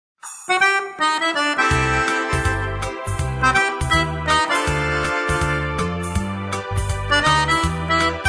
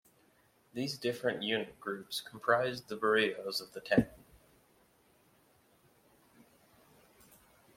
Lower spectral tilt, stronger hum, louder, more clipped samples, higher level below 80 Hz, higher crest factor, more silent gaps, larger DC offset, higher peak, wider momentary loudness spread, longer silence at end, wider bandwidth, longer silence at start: about the same, -4 dB/octave vs -4.5 dB/octave; neither; first, -19 LUFS vs -34 LUFS; neither; first, -32 dBFS vs -66 dBFS; second, 16 dB vs 24 dB; neither; neither; first, -4 dBFS vs -12 dBFS; about the same, 9 LU vs 10 LU; second, 0 s vs 3.6 s; second, 11 kHz vs 16.5 kHz; second, 0.25 s vs 0.75 s